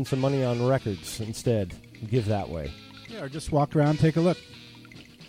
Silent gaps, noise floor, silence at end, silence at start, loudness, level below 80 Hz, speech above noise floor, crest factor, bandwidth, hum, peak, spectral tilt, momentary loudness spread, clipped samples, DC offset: none; -48 dBFS; 0 s; 0 s; -27 LUFS; -48 dBFS; 22 dB; 16 dB; 16 kHz; none; -10 dBFS; -7 dB/octave; 22 LU; under 0.1%; under 0.1%